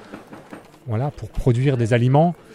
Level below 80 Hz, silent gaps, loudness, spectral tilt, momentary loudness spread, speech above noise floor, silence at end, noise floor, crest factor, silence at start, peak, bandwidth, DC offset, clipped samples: -36 dBFS; none; -20 LUFS; -8 dB/octave; 23 LU; 23 dB; 0.2 s; -42 dBFS; 16 dB; 0.1 s; -4 dBFS; 11 kHz; under 0.1%; under 0.1%